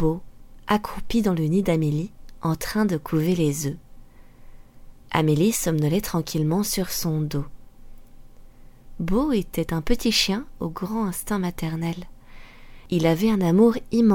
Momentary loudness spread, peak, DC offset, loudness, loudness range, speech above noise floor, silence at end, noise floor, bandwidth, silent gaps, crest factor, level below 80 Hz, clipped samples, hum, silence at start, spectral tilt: 11 LU; -6 dBFS; under 0.1%; -23 LUFS; 3 LU; 22 dB; 0 s; -45 dBFS; 17.5 kHz; none; 18 dB; -40 dBFS; under 0.1%; none; 0 s; -5.5 dB/octave